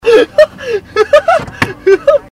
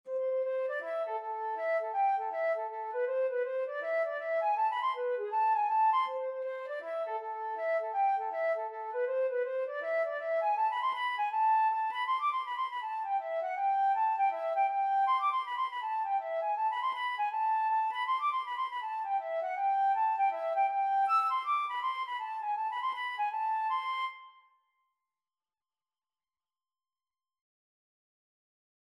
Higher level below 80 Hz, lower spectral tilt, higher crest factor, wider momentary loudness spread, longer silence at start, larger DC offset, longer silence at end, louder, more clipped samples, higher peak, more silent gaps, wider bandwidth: first, -40 dBFS vs under -90 dBFS; first, -5 dB/octave vs 0.5 dB/octave; about the same, 10 dB vs 12 dB; about the same, 8 LU vs 7 LU; about the same, 0.05 s vs 0.05 s; neither; second, 0.1 s vs 4.65 s; first, -10 LUFS vs -32 LUFS; first, 0.9% vs under 0.1%; first, 0 dBFS vs -20 dBFS; neither; first, 15 kHz vs 11.5 kHz